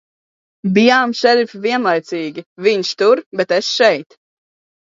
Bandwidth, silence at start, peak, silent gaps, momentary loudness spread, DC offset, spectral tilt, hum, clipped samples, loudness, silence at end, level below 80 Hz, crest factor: 7.8 kHz; 0.65 s; 0 dBFS; 2.46-2.56 s, 3.26-3.31 s; 12 LU; under 0.1%; -4.5 dB/octave; none; under 0.1%; -15 LUFS; 0.85 s; -68 dBFS; 16 dB